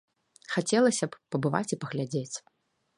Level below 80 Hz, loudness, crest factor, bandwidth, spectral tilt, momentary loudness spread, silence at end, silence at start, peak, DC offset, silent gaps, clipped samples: -74 dBFS; -29 LUFS; 20 dB; 11.5 kHz; -5 dB/octave; 10 LU; 0.6 s; 0.5 s; -10 dBFS; under 0.1%; none; under 0.1%